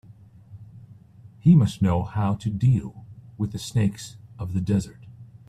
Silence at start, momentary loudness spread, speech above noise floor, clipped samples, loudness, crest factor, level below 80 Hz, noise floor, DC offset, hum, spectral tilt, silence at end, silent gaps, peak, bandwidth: 0.5 s; 21 LU; 27 dB; under 0.1%; -23 LUFS; 18 dB; -50 dBFS; -49 dBFS; under 0.1%; none; -7.5 dB/octave; 0.25 s; none; -6 dBFS; 14 kHz